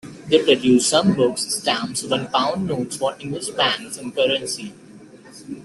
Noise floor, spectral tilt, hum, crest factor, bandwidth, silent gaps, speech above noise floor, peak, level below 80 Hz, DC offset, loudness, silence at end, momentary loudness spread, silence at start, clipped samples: -43 dBFS; -3.5 dB/octave; none; 18 dB; 12.5 kHz; none; 23 dB; -2 dBFS; -58 dBFS; under 0.1%; -20 LUFS; 0 s; 13 LU; 0.05 s; under 0.1%